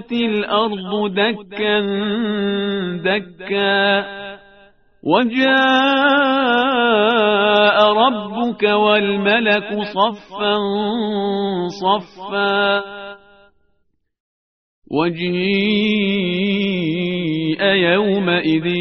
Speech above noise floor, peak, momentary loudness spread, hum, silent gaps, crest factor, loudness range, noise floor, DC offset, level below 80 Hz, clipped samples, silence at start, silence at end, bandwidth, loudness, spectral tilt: 50 dB; 0 dBFS; 8 LU; none; 14.20-14.82 s; 16 dB; 7 LU; -67 dBFS; 0.1%; -58 dBFS; under 0.1%; 0 s; 0 s; 6.4 kHz; -17 LUFS; -2.5 dB/octave